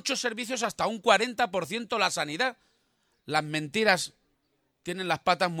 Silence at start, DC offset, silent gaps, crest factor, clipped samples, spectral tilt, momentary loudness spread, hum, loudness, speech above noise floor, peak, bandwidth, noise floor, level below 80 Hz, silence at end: 0.05 s; under 0.1%; none; 22 dB; under 0.1%; -3 dB/octave; 8 LU; none; -27 LUFS; 47 dB; -6 dBFS; 17.5 kHz; -74 dBFS; -68 dBFS; 0 s